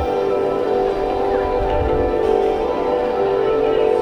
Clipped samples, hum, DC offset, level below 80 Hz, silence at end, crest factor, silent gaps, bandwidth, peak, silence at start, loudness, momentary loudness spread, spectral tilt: under 0.1%; none; under 0.1%; -32 dBFS; 0 s; 12 dB; none; 9.8 kHz; -6 dBFS; 0 s; -18 LUFS; 2 LU; -7.5 dB/octave